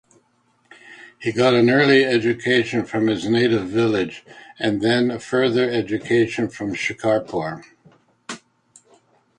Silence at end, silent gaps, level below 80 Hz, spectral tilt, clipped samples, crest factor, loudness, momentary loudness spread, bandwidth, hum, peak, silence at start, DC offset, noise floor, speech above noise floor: 1 s; none; -58 dBFS; -5.5 dB/octave; under 0.1%; 18 dB; -19 LUFS; 14 LU; 10.5 kHz; none; -2 dBFS; 0.85 s; under 0.1%; -63 dBFS; 44 dB